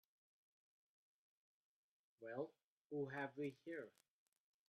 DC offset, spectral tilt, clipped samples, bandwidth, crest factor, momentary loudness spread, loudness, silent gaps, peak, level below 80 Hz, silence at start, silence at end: under 0.1%; -7.5 dB/octave; under 0.1%; 12.5 kHz; 20 dB; 8 LU; -51 LUFS; 2.64-2.90 s; -34 dBFS; under -90 dBFS; 2.2 s; 0.8 s